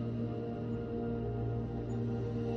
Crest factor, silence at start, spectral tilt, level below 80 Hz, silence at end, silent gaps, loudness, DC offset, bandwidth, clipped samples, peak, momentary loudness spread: 12 dB; 0 s; -10 dB/octave; -50 dBFS; 0 s; none; -37 LUFS; under 0.1%; 7.2 kHz; under 0.1%; -24 dBFS; 2 LU